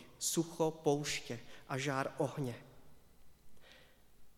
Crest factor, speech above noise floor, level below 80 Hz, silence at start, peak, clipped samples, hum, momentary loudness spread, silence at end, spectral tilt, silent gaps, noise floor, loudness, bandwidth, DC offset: 22 dB; 25 dB; -68 dBFS; 0 s; -18 dBFS; under 0.1%; none; 11 LU; 0 s; -4 dB/octave; none; -62 dBFS; -38 LUFS; 18 kHz; under 0.1%